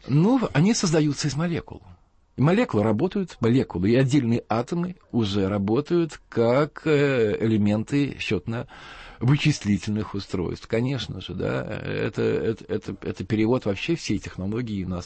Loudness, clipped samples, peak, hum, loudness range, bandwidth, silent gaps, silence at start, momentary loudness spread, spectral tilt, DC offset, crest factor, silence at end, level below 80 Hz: -24 LUFS; under 0.1%; -10 dBFS; none; 4 LU; 8.8 kHz; none; 0.05 s; 10 LU; -6.5 dB/octave; under 0.1%; 14 dB; 0 s; -50 dBFS